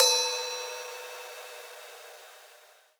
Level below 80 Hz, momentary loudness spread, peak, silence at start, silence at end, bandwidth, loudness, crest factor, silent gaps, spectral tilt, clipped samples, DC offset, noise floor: under -90 dBFS; 23 LU; -8 dBFS; 0 s; 0.4 s; over 20 kHz; -31 LUFS; 26 dB; none; 7 dB/octave; under 0.1%; under 0.1%; -57 dBFS